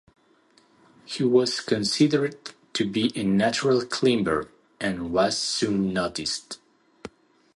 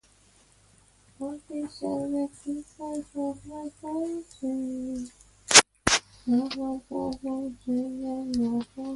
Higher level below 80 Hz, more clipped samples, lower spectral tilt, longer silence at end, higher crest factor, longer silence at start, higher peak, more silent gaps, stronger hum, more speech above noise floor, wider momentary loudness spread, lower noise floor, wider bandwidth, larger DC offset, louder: about the same, -56 dBFS vs -56 dBFS; neither; first, -4.5 dB/octave vs -1.5 dB/octave; first, 0.5 s vs 0 s; second, 18 dB vs 30 dB; about the same, 1.1 s vs 1.2 s; second, -8 dBFS vs 0 dBFS; neither; neither; first, 37 dB vs 29 dB; first, 20 LU vs 15 LU; about the same, -61 dBFS vs -60 dBFS; about the same, 11.5 kHz vs 11.5 kHz; neither; first, -24 LUFS vs -27 LUFS